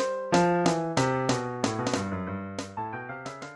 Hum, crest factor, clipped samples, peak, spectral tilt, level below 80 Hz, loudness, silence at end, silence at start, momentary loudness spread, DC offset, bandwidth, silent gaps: none; 20 dB; under 0.1%; -8 dBFS; -5 dB/octave; -56 dBFS; -28 LUFS; 0 s; 0 s; 12 LU; under 0.1%; 12 kHz; none